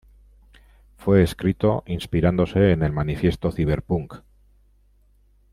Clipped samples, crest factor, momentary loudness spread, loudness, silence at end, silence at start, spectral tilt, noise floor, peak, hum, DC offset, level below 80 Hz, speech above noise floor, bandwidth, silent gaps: under 0.1%; 20 dB; 8 LU; -22 LUFS; 1.35 s; 1 s; -8 dB/octave; -58 dBFS; -4 dBFS; 50 Hz at -40 dBFS; under 0.1%; -40 dBFS; 37 dB; 14 kHz; none